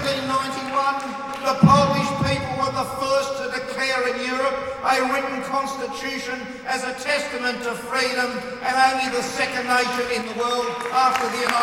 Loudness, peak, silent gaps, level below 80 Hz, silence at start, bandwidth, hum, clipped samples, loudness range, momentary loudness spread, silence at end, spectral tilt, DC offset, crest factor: -22 LUFS; -2 dBFS; none; -50 dBFS; 0 s; 17 kHz; none; under 0.1%; 4 LU; 8 LU; 0 s; -4.5 dB/octave; under 0.1%; 20 dB